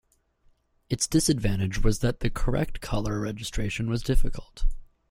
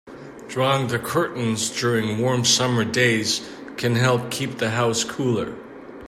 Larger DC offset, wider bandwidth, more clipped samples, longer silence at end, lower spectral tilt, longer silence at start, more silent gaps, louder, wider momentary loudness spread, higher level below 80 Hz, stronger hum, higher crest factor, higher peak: neither; about the same, 15.5 kHz vs 15.5 kHz; neither; first, 0.25 s vs 0 s; about the same, -5 dB/octave vs -4 dB/octave; first, 0.9 s vs 0.05 s; neither; second, -28 LUFS vs -21 LUFS; about the same, 13 LU vs 14 LU; first, -30 dBFS vs -60 dBFS; neither; about the same, 16 dB vs 18 dB; about the same, -8 dBFS vs -6 dBFS